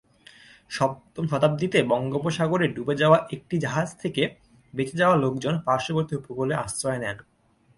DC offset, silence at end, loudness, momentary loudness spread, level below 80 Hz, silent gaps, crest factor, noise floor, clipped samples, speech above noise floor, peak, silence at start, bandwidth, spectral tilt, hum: under 0.1%; 0.6 s; -25 LUFS; 10 LU; -58 dBFS; none; 22 dB; -52 dBFS; under 0.1%; 28 dB; -4 dBFS; 0.7 s; 11.5 kHz; -5.5 dB/octave; none